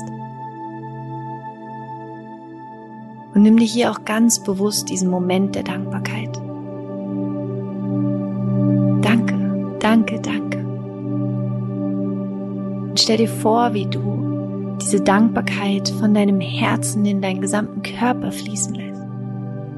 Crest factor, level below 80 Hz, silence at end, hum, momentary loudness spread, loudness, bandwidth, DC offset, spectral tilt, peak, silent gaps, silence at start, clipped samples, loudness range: 18 dB; -58 dBFS; 0 s; none; 16 LU; -20 LUFS; 12 kHz; under 0.1%; -5 dB/octave; -2 dBFS; none; 0 s; under 0.1%; 5 LU